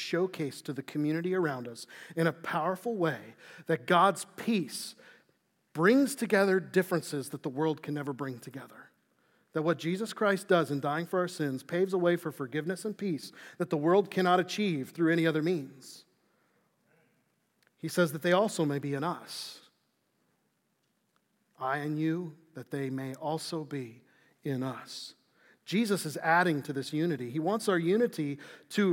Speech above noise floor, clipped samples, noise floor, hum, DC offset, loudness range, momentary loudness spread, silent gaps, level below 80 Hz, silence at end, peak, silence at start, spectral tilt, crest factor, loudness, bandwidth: 46 dB; under 0.1%; -76 dBFS; none; under 0.1%; 7 LU; 16 LU; none; under -90 dBFS; 0 s; -12 dBFS; 0 s; -5.5 dB/octave; 20 dB; -31 LUFS; 17 kHz